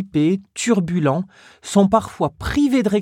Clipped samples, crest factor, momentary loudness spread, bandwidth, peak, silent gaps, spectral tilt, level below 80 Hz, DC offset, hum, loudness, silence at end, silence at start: under 0.1%; 16 dB; 9 LU; 14.5 kHz; -4 dBFS; none; -6 dB/octave; -42 dBFS; under 0.1%; none; -19 LUFS; 0 s; 0 s